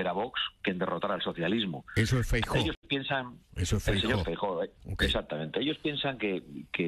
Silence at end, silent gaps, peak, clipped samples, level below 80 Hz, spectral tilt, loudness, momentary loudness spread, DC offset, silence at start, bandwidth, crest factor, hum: 0 s; 2.77-2.82 s; -14 dBFS; under 0.1%; -42 dBFS; -5 dB/octave; -31 LUFS; 6 LU; under 0.1%; 0 s; 13 kHz; 18 dB; none